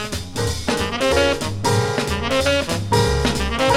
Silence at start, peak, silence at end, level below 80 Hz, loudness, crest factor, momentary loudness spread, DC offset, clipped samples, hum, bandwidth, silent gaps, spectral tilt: 0 s; -4 dBFS; 0 s; -32 dBFS; -20 LUFS; 16 dB; 5 LU; under 0.1%; under 0.1%; none; 16.5 kHz; none; -4.5 dB/octave